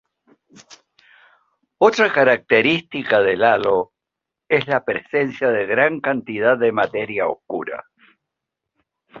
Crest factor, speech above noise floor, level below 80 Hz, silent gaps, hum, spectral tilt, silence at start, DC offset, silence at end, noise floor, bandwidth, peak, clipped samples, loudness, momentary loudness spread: 18 dB; 66 dB; -62 dBFS; none; none; -5.5 dB/octave; 0.7 s; under 0.1%; 0 s; -84 dBFS; 7.4 kHz; -2 dBFS; under 0.1%; -18 LUFS; 9 LU